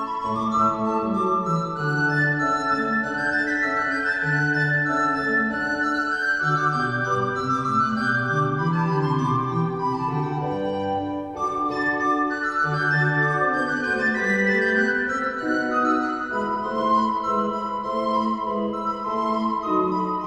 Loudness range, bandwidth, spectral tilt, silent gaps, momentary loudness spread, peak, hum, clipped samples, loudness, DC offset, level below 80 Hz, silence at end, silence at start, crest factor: 3 LU; 11 kHz; -6.5 dB/octave; none; 5 LU; -8 dBFS; none; under 0.1%; -22 LUFS; under 0.1%; -56 dBFS; 0 s; 0 s; 14 dB